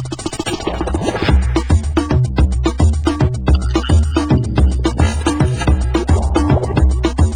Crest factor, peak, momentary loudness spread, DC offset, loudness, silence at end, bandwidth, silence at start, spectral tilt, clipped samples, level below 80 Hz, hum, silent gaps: 14 dB; 0 dBFS; 5 LU; 0.8%; -16 LUFS; 0 s; 10 kHz; 0 s; -6.5 dB/octave; under 0.1%; -16 dBFS; none; none